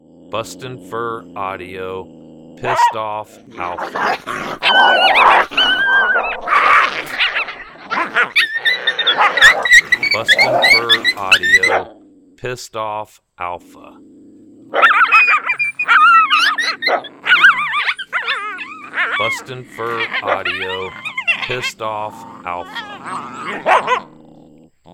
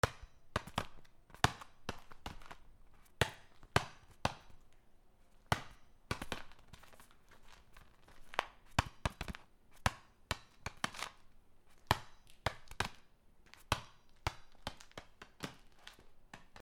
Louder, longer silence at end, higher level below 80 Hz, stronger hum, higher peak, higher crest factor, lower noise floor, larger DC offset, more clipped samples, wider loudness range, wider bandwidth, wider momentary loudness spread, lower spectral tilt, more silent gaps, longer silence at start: first, -13 LUFS vs -41 LUFS; first, 0.9 s vs 0 s; about the same, -52 dBFS vs -56 dBFS; neither; first, 0 dBFS vs -10 dBFS; second, 16 dB vs 34 dB; second, -45 dBFS vs -63 dBFS; neither; neither; first, 11 LU vs 5 LU; about the same, 19 kHz vs over 20 kHz; second, 18 LU vs 22 LU; second, -1.5 dB/octave vs -4 dB/octave; neither; first, 0.3 s vs 0.05 s